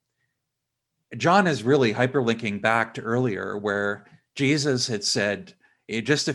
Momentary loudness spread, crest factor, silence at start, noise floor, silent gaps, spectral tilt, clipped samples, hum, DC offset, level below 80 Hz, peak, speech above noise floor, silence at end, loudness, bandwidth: 10 LU; 20 dB; 1.1 s; -82 dBFS; none; -4.5 dB/octave; under 0.1%; none; under 0.1%; -68 dBFS; -4 dBFS; 59 dB; 0 s; -23 LUFS; 12 kHz